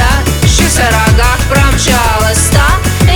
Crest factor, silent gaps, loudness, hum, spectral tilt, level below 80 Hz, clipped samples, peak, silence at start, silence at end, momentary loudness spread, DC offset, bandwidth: 8 dB; none; -9 LUFS; none; -4 dB/octave; -14 dBFS; under 0.1%; 0 dBFS; 0 s; 0 s; 2 LU; under 0.1%; over 20 kHz